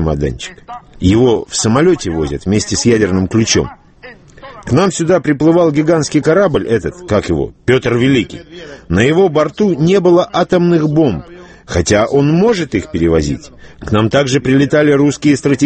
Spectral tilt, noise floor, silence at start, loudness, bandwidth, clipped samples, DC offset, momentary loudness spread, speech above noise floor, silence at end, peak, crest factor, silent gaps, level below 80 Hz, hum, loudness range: -5.5 dB/octave; -37 dBFS; 0 s; -12 LUFS; 8.8 kHz; under 0.1%; under 0.1%; 10 LU; 25 dB; 0 s; 0 dBFS; 12 dB; none; -34 dBFS; none; 2 LU